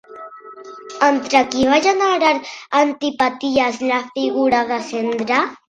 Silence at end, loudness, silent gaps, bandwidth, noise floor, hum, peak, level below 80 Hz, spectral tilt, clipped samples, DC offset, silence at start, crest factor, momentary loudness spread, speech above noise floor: 0.15 s; -17 LUFS; none; 10.5 kHz; -37 dBFS; none; 0 dBFS; -54 dBFS; -3 dB/octave; under 0.1%; under 0.1%; 0.1 s; 18 dB; 21 LU; 20 dB